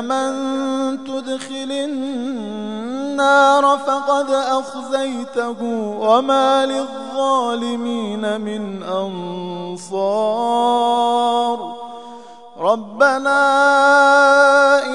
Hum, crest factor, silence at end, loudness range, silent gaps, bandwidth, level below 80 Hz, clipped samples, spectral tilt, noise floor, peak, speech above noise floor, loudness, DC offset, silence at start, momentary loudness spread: none; 18 dB; 0 s; 7 LU; none; 11 kHz; -70 dBFS; under 0.1%; -4 dB/octave; -38 dBFS; 0 dBFS; 21 dB; -17 LUFS; 0.4%; 0 s; 15 LU